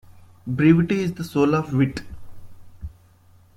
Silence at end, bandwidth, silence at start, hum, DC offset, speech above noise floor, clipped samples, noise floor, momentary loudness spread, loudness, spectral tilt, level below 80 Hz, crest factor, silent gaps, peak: 0.7 s; 14 kHz; 0.1 s; none; under 0.1%; 33 dB; under 0.1%; -53 dBFS; 24 LU; -21 LUFS; -8 dB/octave; -46 dBFS; 18 dB; none; -4 dBFS